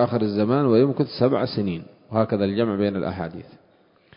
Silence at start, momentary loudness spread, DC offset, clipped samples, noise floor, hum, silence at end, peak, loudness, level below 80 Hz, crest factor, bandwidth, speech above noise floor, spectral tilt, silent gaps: 0 s; 12 LU; under 0.1%; under 0.1%; -58 dBFS; none; 0.75 s; -4 dBFS; -22 LUFS; -52 dBFS; 18 dB; 5.4 kHz; 37 dB; -12 dB/octave; none